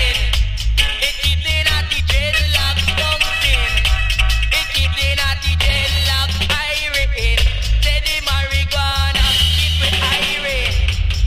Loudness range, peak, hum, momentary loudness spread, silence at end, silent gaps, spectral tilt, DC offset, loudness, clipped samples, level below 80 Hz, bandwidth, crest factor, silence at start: 1 LU; 0 dBFS; none; 3 LU; 0 s; none; -2.5 dB/octave; under 0.1%; -16 LUFS; under 0.1%; -20 dBFS; 16 kHz; 14 dB; 0 s